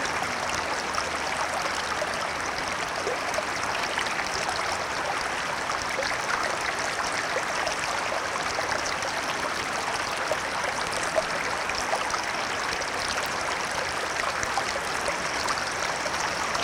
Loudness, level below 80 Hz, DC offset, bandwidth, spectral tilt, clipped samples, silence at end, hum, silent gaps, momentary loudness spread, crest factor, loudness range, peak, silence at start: -27 LUFS; -54 dBFS; under 0.1%; 18 kHz; -1.5 dB/octave; under 0.1%; 0 s; none; none; 1 LU; 18 dB; 1 LU; -10 dBFS; 0 s